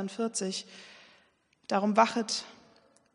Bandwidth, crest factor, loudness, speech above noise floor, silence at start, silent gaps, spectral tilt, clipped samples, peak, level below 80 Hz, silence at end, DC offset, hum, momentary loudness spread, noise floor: 10.5 kHz; 24 dB; -29 LUFS; 38 dB; 0 s; none; -3.5 dB/octave; under 0.1%; -8 dBFS; -82 dBFS; 0.6 s; under 0.1%; none; 24 LU; -68 dBFS